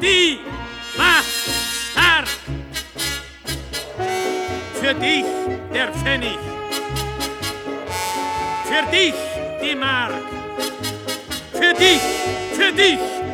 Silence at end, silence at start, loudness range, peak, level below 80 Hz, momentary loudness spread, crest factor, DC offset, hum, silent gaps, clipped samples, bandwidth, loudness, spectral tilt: 0 s; 0 s; 5 LU; 0 dBFS; -40 dBFS; 14 LU; 20 dB; under 0.1%; none; none; under 0.1%; 19 kHz; -19 LUFS; -2.5 dB/octave